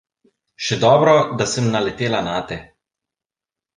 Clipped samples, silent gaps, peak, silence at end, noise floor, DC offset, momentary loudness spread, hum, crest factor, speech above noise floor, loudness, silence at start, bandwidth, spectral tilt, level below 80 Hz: under 0.1%; none; -2 dBFS; 1.15 s; -89 dBFS; under 0.1%; 13 LU; none; 18 dB; 72 dB; -18 LUFS; 0.6 s; 9.8 kHz; -5 dB/octave; -52 dBFS